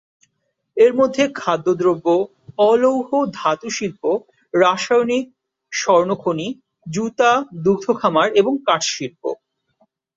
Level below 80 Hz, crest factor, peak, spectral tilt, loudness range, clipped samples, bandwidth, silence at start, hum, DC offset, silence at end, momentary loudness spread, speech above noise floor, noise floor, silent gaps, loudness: -62 dBFS; 16 dB; -2 dBFS; -4.5 dB/octave; 2 LU; under 0.1%; 7.8 kHz; 0.75 s; none; under 0.1%; 0.85 s; 12 LU; 55 dB; -72 dBFS; none; -18 LUFS